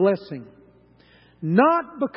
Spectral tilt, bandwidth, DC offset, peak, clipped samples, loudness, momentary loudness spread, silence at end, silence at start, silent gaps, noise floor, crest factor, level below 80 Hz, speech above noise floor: -12 dB/octave; 5.8 kHz; under 0.1%; -4 dBFS; under 0.1%; -21 LUFS; 20 LU; 0.1 s; 0 s; none; -54 dBFS; 20 dB; -66 dBFS; 33 dB